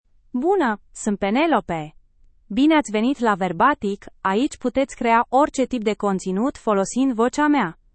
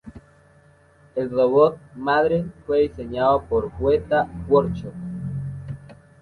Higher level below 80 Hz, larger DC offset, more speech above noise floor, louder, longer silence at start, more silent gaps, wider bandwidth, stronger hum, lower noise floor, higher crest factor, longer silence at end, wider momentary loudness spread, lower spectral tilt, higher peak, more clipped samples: second, -50 dBFS vs -44 dBFS; neither; about the same, 34 dB vs 33 dB; about the same, -21 LUFS vs -22 LUFS; first, 0.35 s vs 0.05 s; neither; first, 8.8 kHz vs 4.6 kHz; neither; about the same, -54 dBFS vs -54 dBFS; about the same, 16 dB vs 18 dB; about the same, 0.25 s vs 0.25 s; second, 9 LU vs 14 LU; second, -5 dB/octave vs -8.5 dB/octave; about the same, -4 dBFS vs -4 dBFS; neither